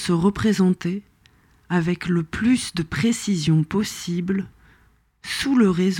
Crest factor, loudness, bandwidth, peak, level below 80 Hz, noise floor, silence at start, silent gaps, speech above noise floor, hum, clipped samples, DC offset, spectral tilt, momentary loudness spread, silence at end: 14 dB; -22 LUFS; 16.5 kHz; -8 dBFS; -48 dBFS; -58 dBFS; 0 s; none; 38 dB; none; under 0.1%; under 0.1%; -5.5 dB/octave; 9 LU; 0 s